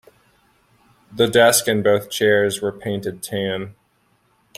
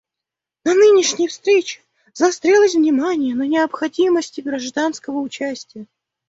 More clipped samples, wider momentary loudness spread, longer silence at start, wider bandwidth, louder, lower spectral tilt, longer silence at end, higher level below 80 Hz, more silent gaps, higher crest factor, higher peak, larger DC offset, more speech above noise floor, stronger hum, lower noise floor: neither; about the same, 13 LU vs 13 LU; first, 1.1 s vs 0.65 s; first, 16 kHz vs 8 kHz; about the same, -18 LUFS vs -17 LUFS; about the same, -3.5 dB/octave vs -2.5 dB/octave; first, 0.85 s vs 0.45 s; first, -60 dBFS vs -66 dBFS; neither; about the same, 20 dB vs 16 dB; about the same, -2 dBFS vs -2 dBFS; neither; second, 44 dB vs 67 dB; neither; second, -62 dBFS vs -85 dBFS